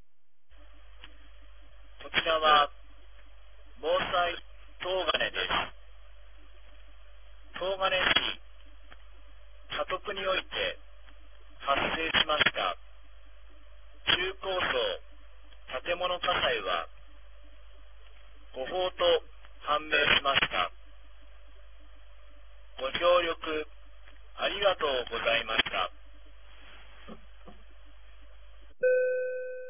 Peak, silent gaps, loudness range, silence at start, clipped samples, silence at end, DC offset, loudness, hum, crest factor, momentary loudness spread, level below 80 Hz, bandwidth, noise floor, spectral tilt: -8 dBFS; none; 5 LU; 0.6 s; under 0.1%; 0 s; 0.5%; -28 LUFS; none; 24 dB; 17 LU; -54 dBFS; 3.7 kHz; -82 dBFS; 0.5 dB/octave